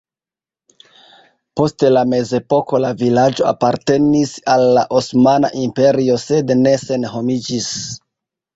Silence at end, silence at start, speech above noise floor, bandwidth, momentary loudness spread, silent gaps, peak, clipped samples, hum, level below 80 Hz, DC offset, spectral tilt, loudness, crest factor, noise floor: 0.6 s; 1.55 s; over 76 dB; 8 kHz; 8 LU; none; -2 dBFS; under 0.1%; none; -52 dBFS; under 0.1%; -5.5 dB/octave; -15 LUFS; 14 dB; under -90 dBFS